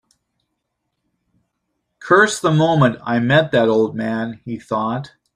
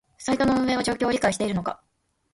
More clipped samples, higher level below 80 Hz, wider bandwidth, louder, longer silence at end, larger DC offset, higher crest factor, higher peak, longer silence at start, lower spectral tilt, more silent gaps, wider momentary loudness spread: neither; second, -56 dBFS vs -50 dBFS; about the same, 12.5 kHz vs 11.5 kHz; first, -17 LUFS vs -24 LUFS; second, 0.3 s vs 0.6 s; neither; about the same, 18 dB vs 18 dB; first, -2 dBFS vs -8 dBFS; first, 2 s vs 0.2 s; about the same, -5.5 dB/octave vs -4.5 dB/octave; neither; first, 13 LU vs 9 LU